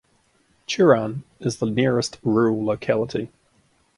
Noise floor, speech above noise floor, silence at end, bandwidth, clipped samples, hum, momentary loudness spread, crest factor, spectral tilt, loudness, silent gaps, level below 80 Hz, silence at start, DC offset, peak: -63 dBFS; 42 dB; 0.7 s; 11.5 kHz; under 0.1%; none; 13 LU; 20 dB; -6 dB/octave; -22 LUFS; none; -58 dBFS; 0.7 s; under 0.1%; -2 dBFS